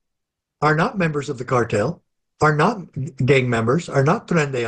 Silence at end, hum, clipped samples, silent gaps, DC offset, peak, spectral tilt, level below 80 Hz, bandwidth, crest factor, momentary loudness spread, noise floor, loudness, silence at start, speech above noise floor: 0 s; none; under 0.1%; none; under 0.1%; -4 dBFS; -6.5 dB/octave; -50 dBFS; 9.4 kHz; 16 dB; 9 LU; -80 dBFS; -20 LUFS; 0.6 s; 61 dB